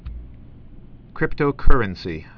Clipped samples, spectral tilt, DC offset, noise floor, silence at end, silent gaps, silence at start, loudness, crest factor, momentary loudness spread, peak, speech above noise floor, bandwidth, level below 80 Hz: under 0.1%; -8.5 dB/octave; under 0.1%; -41 dBFS; 0.15 s; none; 0.05 s; -23 LUFS; 18 dB; 22 LU; 0 dBFS; 26 dB; 5.4 kHz; -22 dBFS